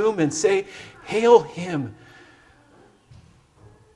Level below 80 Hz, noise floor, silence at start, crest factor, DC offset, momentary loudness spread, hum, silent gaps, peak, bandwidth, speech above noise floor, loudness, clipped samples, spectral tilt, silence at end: -62 dBFS; -54 dBFS; 0 s; 22 dB; under 0.1%; 20 LU; none; none; -2 dBFS; 11 kHz; 34 dB; -20 LUFS; under 0.1%; -5 dB/octave; 2.05 s